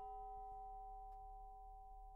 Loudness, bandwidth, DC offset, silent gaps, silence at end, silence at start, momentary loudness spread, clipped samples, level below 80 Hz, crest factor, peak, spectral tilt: -56 LUFS; 3.3 kHz; under 0.1%; none; 0 s; 0 s; 7 LU; under 0.1%; -60 dBFS; 10 dB; -44 dBFS; -4.5 dB/octave